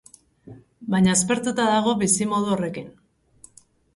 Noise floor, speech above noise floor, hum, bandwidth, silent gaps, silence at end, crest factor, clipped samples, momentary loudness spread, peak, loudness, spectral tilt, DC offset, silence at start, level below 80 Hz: -56 dBFS; 34 dB; none; 11.5 kHz; none; 1.05 s; 18 dB; under 0.1%; 11 LU; -6 dBFS; -21 LUFS; -4 dB/octave; under 0.1%; 0.45 s; -58 dBFS